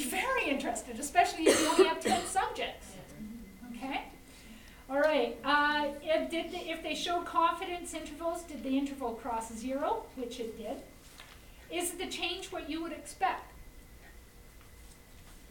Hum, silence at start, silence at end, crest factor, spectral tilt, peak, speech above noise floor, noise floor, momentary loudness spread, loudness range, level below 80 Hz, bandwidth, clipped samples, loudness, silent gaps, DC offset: none; 0 s; 0 s; 22 dB; -2.5 dB/octave; -10 dBFS; 20 dB; -54 dBFS; 22 LU; 8 LU; -56 dBFS; 17 kHz; under 0.1%; -32 LUFS; none; under 0.1%